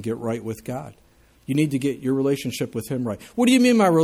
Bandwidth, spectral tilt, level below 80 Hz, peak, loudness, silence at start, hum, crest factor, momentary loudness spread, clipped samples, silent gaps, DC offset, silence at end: 15.5 kHz; -5.5 dB/octave; -58 dBFS; -6 dBFS; -22 LUFS; 0 s; none; 16 dB; 16 LU; under 0.1%; none; under 0.1%; 0 s